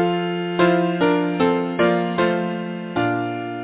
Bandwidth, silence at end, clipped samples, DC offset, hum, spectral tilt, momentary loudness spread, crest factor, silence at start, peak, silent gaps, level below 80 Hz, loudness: 4 kHz; 0 s; under 0.1%; under 0.1%; none; -10.5 dB/octave; 8 LU; 14 dB; 0 s; -6 dBFS; none; -56 dBFS; -20 LUFS